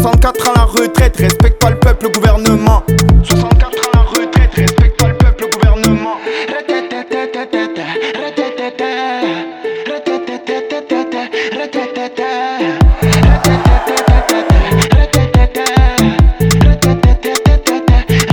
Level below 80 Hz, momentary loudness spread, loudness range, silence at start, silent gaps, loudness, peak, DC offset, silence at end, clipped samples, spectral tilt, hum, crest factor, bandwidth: -14 dBFS; 9 LU; 7 LU; 0 s; none; -12 LUFS; 0 dBFS; under 0.1%; 0 s; under 0.1%; -5.5 dB/octave; none; 10 dB; 19.5 kHz